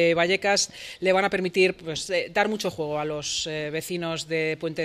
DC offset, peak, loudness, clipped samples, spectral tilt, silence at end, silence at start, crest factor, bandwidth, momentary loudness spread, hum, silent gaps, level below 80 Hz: under 0.1%; -6 dBFS; -25 LUFS; under 0.1%; -3.5 dB/octave; 0 s; 0 s; 18 dB; 15.5 kHz; 8 LU; none; none; -60 dBFS